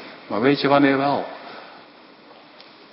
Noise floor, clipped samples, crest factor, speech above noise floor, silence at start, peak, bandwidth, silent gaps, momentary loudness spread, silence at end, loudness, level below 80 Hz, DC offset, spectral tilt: -47 dBFS; under 0.1%; 20 dB; 29 dB; 0 s; -2 dBFS; 5.8 kHz; none; 21 LU; 1.15 s; -19 LUFS; -68 dBFS; under 0.1%; -10.5 dB/octave